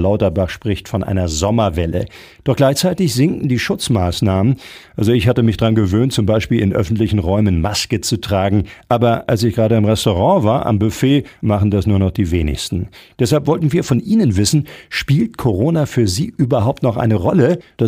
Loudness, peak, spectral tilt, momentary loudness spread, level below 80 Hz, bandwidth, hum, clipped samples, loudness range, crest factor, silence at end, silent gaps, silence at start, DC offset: -16 LUFS; 0 dBFS; -6 dB/octave; 6 LU; -38 dBFS; 16 kHz; none; under 0.1%; 2 LU; 14 dB; 0 s; none; 0 s; under 0.1%